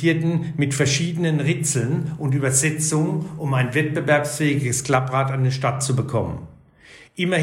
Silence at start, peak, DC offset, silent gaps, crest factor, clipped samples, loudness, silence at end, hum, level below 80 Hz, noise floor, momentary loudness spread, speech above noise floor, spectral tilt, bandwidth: 0 s; -4 dBFS; under 0.1%; none; 18 dB; under 0.1%; -21 LUFS; 0 s; none; -52 dBFS; -48 dBFS; 6 LU; 27 dB; -5 dB/octave; 16 kHz